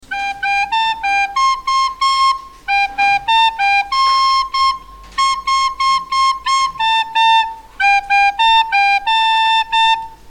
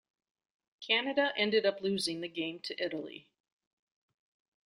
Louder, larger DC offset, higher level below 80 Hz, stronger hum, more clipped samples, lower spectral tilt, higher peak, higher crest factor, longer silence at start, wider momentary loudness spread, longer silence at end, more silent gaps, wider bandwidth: first, -14 LUFS vs -32 LUFS; neither; first, -44 dBFS vs -80 dBFS; neither; neither; second, 1.5 dB/octave vs -3.5 dB/octave; first, -4 dBFS vs -14 dBFS; second, 12 dB vs 22 dB; second, 0.1 s vs 0.8 s; second, 5 LU vs 15 LU; second, 0 s vs 1.45 s; neither; second, 12 kHz vs 14 kHz